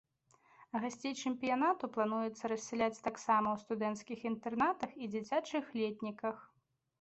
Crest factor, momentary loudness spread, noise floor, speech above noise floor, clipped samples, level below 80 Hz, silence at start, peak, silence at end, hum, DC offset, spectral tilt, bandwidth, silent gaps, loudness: 18 dB; 8 LU; -70 dBFS; 34 dB; under 0.1%; -76 dBFS; 0.6 s; -20 dBFS; 0.55 s; none; under 0.1%; -4.5 dB/octave; 8.2 kHz; none; -37 LUFS